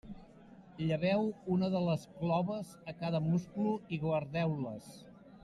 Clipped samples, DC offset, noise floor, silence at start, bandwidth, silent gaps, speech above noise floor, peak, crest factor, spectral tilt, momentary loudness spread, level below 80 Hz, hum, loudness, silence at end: under 0.1%; under 0.1%; -56 dBFS; 0.05 s; 12 kHz; none; 22 dB; -20 dBFS; 14 dB; -8 dB/octave; 18 LU; -64 dBFS; none; -35 LUFS; 0.05 s